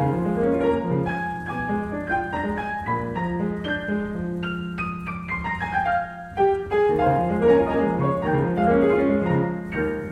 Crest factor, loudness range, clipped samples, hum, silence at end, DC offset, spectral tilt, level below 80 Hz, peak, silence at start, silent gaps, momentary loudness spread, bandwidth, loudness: 16 dB; 6 LU; under 0.1%; none; 0 s; under 0.1%; -8.5 dB/octave; -44 dBFS; -8 dBFS; 0 s; none; 9 LU; 9.4 kHz; -23 LUFS